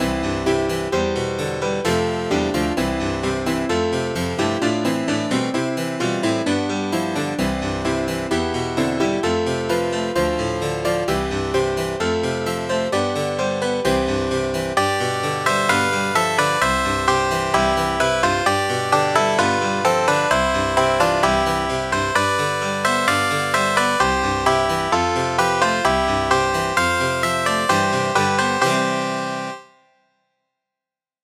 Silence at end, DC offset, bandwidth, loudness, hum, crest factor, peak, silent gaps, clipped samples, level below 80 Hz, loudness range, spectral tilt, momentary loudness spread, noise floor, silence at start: 1.6 s; under 0.1%; 16.5 kHz; -20 LUFS; none; 18 dB; -2 dBFS; none; under 0.1%; -40 dBFS; 4 LU; -4 dB/octave; 5 LU; -88 dBFS; 0 s